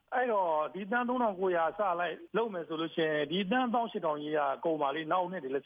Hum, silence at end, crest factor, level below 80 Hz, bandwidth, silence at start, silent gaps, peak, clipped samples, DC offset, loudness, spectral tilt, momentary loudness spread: none; 0.05 s; 14 dB; -76 dBFS; 5 kHz; 0.1 s; none; -18 dBFS; under 0.1%; under 0.1%; -32 LUFS; -8 dB/octave; 5 LU